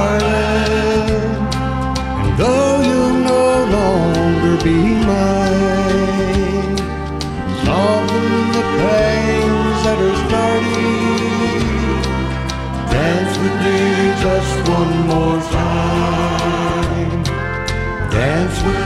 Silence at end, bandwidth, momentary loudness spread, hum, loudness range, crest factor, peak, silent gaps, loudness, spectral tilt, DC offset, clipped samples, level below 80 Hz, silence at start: 0 s; 13.5 kHz; 6 LU; none; 3 LU; 12 dB; -4 dBFS; none; -16 LUFS; -6 dB/octave; under 0.1%; under 0.1%; -26 dBFS; 0 s